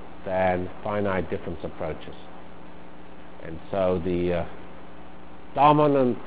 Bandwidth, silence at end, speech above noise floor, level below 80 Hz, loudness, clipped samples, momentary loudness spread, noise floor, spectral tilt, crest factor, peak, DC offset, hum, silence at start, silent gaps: 4 kHz; 0 s; 21 dB; -48 dBFS; -25 LUFS; under 0.1%; 26 LU; -46 dBFS; -11 dB/octave; 22 dB; -4 dBFS; 2%; none; 0 s; none